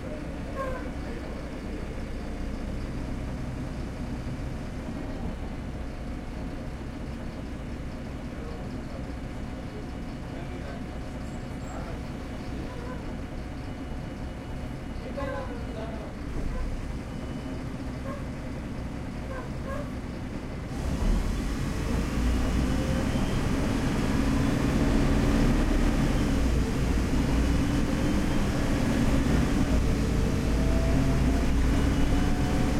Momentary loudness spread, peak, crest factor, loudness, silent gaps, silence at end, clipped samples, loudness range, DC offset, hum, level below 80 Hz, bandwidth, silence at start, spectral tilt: 11 LU; -12 dBFS; 16 dB; -30 LUFS; none; 0 s; under 0.1%; 11 LU; under 0.1%; none; -32 dBFS; 15 kHz; 0 s; -6.5 dB/octave